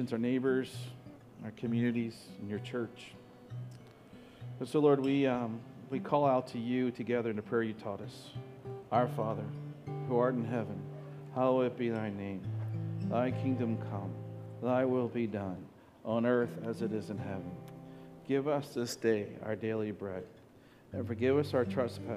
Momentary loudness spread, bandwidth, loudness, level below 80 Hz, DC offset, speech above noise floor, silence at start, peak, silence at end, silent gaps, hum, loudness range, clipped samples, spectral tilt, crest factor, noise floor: 17 LU; 14.5 kHz; -34 LUFS; -72 dBFS; under 0.1%; 26 dB; 0 s; -14 dBFS; 0 s; none; none; 4 LU; under 0.1%; -7.5 dB/octave; 20 dB; -59 dBFS